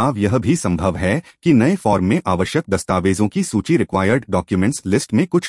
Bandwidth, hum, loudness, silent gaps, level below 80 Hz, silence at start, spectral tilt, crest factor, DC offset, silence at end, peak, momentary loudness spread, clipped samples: 12 kHz; none; -18 LUFS; none; -46 dBFS; 0 s; -6 dB/octave; 14 dB; under 0.1%; 0 s; -2 dBFS; 5 LU; under 0.1%